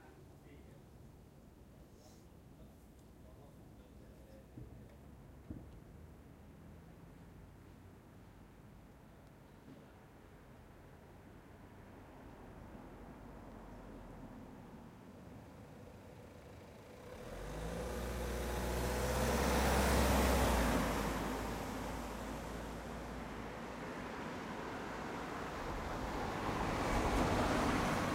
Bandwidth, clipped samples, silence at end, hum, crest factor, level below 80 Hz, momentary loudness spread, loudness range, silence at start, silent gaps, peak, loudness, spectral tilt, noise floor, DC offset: 16 kHz; under 0.1%; 0 s; none; 22 dB; -48 dBFS; 25 LU; 24 LU; 0 s; none; -20 dBFS; -38 LUFS; -5 dB/octave; -59 dBFS; under 0.1%